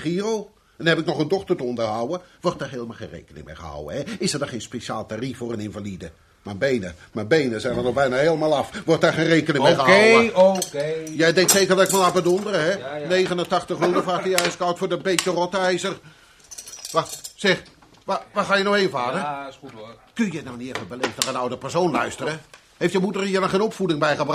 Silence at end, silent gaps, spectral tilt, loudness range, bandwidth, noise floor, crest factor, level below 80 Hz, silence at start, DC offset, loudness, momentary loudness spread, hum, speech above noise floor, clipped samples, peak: 0 s; none; -4 dB/octave; 11 LU; 15 kHz; -43 dBFS; 20 dB; -56 dBFS; 0 s; under 0.1%; -21 LUFS; 18 LU; none; 21 dB; under 0.1%; -2 dBFS